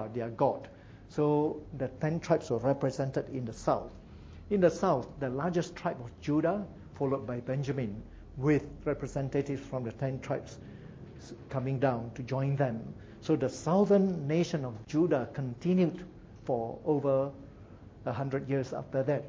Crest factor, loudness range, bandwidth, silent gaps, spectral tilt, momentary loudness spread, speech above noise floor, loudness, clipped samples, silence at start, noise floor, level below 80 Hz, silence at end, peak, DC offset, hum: 20 dB; 5 LU; 8 kHz; none; -7.5 dB/octave; 18 LU; 20 dB; -32 LUFS; under 0.1%; 0 s; -51 dBFS; -56 dBFS; 0 s; -12 dBFS; under 0.1%; none